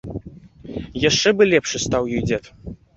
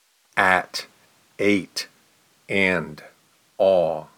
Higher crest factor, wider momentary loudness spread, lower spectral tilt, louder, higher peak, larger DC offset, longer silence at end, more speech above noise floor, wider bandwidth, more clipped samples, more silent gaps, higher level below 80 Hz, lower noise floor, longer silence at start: about the same, 18 dB vs 22 dB; first, 19 LU vs 13 LU; about the same, -4 dB/octave vs -4.5 dB/octave; first, -19 LUFS vs -22 LUFS; about the same, -2 dBFS vs -2 dBFS; neither; about the same, 0.2 s vs 0.15 s; second, 22 dB vs 38 dB; second, 8 kHz vs 19 kHz; neither; neither; first, -42 dBFS vs -64 dBFS; second, -41 dBFS vs -60 dBFS; second, 0.05 s vs 0.35 s